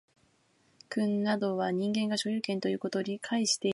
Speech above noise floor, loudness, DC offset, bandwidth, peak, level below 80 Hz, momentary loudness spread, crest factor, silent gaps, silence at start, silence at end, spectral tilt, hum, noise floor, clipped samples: 38 dB; -31 LUFS; under 0.1%; 11.5 kHz; -14 dBFS; -78 dBFS; 4 LU; 18 dB; none; 0.9 s; 0 s; -4 dB/octave; none; -69 dBFS; under 0.1%